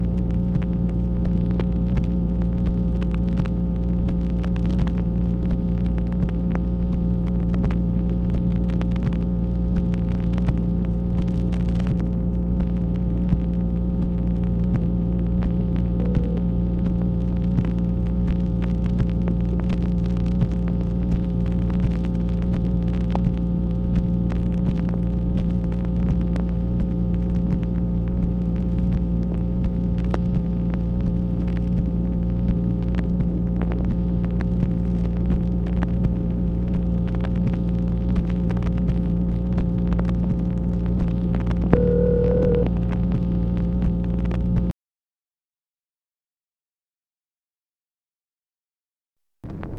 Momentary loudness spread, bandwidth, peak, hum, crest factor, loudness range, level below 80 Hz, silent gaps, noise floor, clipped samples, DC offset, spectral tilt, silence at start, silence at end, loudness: 2 LU; 4.6 kHz; 0 dBFS; none; 22 dB; 2 LU; -26 dBFS; 45.89-45.93 s, 47.58-47.63 s, 47.81-47.85 s; under -90 dBFS; under 0.1%; under 0.1%; -10.5 dB/octave; 0 s; 0 s; -23 LUFS